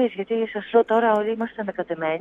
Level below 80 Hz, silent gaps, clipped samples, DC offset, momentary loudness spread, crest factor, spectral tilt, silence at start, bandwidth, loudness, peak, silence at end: -64 dBFS; none; under 0.1%; under 0.1%; 9 LU; 16 dB; -7.5 dB/octave; 0 s; 3.9 kHz; -23 LUFS; -6 dBFS; 0 s